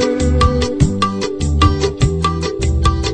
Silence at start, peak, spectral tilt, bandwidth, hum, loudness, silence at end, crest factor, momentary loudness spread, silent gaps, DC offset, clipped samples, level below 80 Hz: 0 s; 0 dBFS; -6 dB/octave; 9.8 kHz; none; -16 LUFS; 0 s; 14 dB; 4 LU; none; under 0.1%; under 0.1%; -20 dBFS